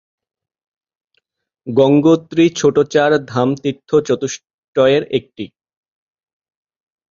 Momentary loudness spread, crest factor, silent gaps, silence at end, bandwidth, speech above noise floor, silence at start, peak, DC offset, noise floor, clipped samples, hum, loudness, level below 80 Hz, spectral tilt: 17 LU; 16 dB; 4.54-4.73 s; 1.65 s; 7.6 kHz; 55 dB; 1.65 s; 0 dBFS; under 0.1%; -69 dBFS; under 0.1%; none; -15 LUFS; -56 dBFS; -6 dB/octave